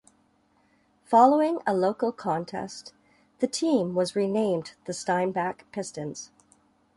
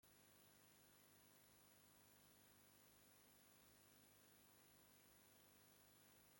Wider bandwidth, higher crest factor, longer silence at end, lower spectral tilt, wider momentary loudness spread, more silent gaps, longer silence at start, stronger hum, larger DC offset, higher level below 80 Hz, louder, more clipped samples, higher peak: second, 11.5 kHz vs 16.5 kHz; first, 22 dB vs 16 dB; first, 0.7 s vs 0 s; first, -5 dB/octave vs -2.5 dB/octave; first, 16 LU vs 0 LU; neither; first, 1.1 s vs 0.05 s; second, none vs 50 Hz at -85 dBFS; neither; first, -70 dBFS vs under -90 dBFS; first, -26 LUFS vs -70 LUFS; neither; first, -6 dBFS vs -56 dBFS